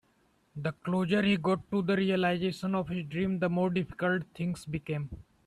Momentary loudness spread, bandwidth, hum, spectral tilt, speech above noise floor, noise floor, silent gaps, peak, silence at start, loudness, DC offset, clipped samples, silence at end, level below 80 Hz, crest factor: 10 LU; 12 kHz; none; -7 dB/octave; 39 dB; -69 dBFS; none; -16 dBFS; 0.55 s; -31 LUFS; under 0.1%; under 0.1%; 0.25 s; -60 dBFS; 14 dB